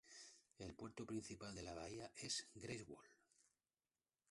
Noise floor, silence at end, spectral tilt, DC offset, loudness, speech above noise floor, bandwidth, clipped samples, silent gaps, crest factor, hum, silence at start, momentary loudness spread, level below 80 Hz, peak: under -90 dBFS; 1.15 s; -3.5 dB/octave; under 0.1%; -52 LUFS; over 37 dB; 11.5 kHz; under 0.1%; none; 22 dB; none; 0.05 s; 14 LU; -74 dBFS; -32 dBFS